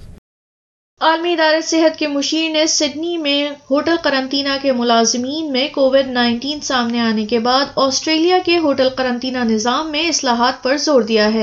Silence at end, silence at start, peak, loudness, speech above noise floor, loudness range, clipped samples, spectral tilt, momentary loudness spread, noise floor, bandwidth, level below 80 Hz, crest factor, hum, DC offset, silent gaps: 0 s; 0 s; -2 dBFS; -16 LUFS; over 74 dB; 1 LU; under 0.1%; -2.5 dB/octave; 5 LU; under -90 dBFS; 7.8 kHz; -52 dBFS; 14 dB; none; under 0.1%; 0.18-0.97 s